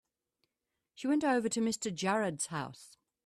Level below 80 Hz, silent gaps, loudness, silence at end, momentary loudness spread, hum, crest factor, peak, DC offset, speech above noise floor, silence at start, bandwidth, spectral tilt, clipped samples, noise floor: -76 dBFS; none; -33 LUFS; 0.4 s; 10 LU; none; 16 dB; -18 dBFS; under 0.1%; 55 dB; 1 s; 14 kHz; -4 dB/octave; under 0.1%; -87 dBFS